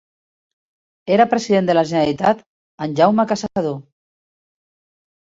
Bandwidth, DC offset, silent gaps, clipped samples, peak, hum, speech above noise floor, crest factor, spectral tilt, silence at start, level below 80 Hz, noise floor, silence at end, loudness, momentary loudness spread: 8 kHz; under 0.1%; 2.46-2.78 s; under 0.1%; -2 dBFS; none; over 73 dB; 18 dB; -6 dB/octave; 1.05 s; -58 dBFS; under -90 dBFS; 1.4 s; -17 LUFS; 11 LU